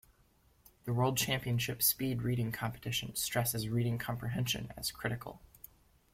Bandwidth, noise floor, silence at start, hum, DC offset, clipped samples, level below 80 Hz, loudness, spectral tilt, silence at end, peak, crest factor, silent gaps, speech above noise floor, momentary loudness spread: 16.5 kHz; -68 dBFS; 0.85 s; none; under 0.1%; under 0.1%; -60 dBFS; -34 LUFS; -4 dB/octave; 0.75 s; -14 dBFS; 22 dB; none; 34 dB; 17 LU